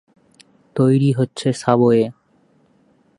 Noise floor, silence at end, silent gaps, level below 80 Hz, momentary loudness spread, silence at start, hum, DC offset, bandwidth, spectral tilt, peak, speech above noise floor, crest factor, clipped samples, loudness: -58 dBFS; 1.1 s; none; -62 dBFS; 8 LU; 0.75 s; none; under 0.1%; 11.5 kHz; -7.5 dB/octave; 0 dBFS; 42 dB; 18 dB; under 0.1%; -17 LUFS